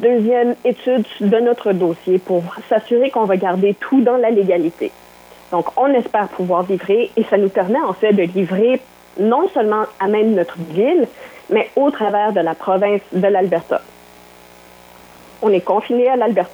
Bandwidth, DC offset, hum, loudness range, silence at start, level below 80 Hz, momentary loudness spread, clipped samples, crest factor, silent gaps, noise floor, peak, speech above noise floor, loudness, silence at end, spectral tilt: over 20 kHz; under 0.1%; none; 3 LU; 0 s; -64 dBFS; 6 LU; under 0.1%; 16 dB; none; -43 dBFS; 0 dBFS; 27 dB; -16 LUFS; 0 s; -7.5 dB/octave